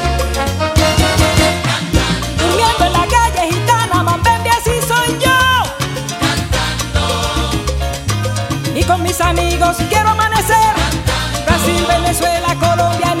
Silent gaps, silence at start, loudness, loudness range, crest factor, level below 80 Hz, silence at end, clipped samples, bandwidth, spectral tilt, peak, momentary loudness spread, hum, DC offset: none; 0 s; -14 LUFS; 3 LU; 14 dB; -24 dBFS; 0 s; under 0.1%; 16.5 kHz; -4 dB/octave; 0 dBFS; 6 LU; none; under 0.1%